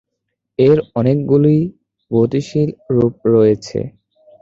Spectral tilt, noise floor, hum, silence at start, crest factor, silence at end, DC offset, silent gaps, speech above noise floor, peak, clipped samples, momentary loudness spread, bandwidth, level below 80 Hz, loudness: -9 dB/octave; -76 dBFS; none; 0.6 s; 14 dB; 0.55 s; under 0.1%; none; 62 dB; 0 dBFS; under 0.1%; 12 LU; 7.8 kHz; -50 dBFS; -15 LUFS